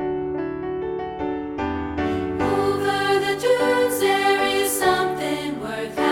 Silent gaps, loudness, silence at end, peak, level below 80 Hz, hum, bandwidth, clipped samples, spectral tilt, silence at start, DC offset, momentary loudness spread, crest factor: none; -22 LUFS; 0 s; -6 dBFS; -46 dBFS; none; 18.5 kHz; under 0.1%; -4 dB/octave; 0 s; under 0.1%; 9 LU; 16 dB